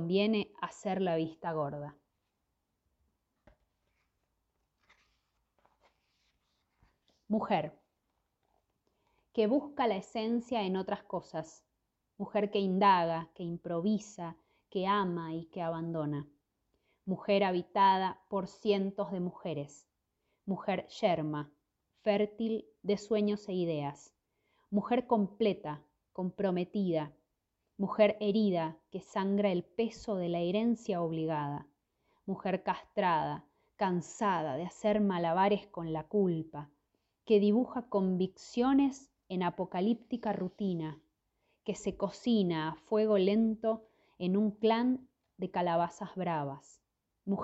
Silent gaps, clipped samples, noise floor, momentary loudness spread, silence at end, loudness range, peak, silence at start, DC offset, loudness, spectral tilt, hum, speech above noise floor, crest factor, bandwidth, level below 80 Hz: none; under 0.1%; -83 dBFS; 13 LU; 0 s; 5 LU; -14 dBFS; 0 s; under 0.1%; -33 LUFS; -7 dB/octave; none; 51 dB; 20 dB; 8.2 kHz; -70 dBFS